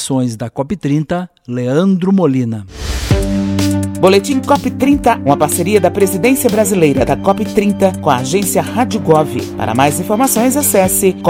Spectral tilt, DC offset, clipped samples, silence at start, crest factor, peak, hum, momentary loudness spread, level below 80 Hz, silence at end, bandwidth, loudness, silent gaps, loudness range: -5 dB/octave; under 0.1%; 0.3%; 0 s; 12 dB; 0 dBFS; none; 8 LU; -32 dBFS; 0 s; 17.5 kHz; -13 LUFS; none; 3 LU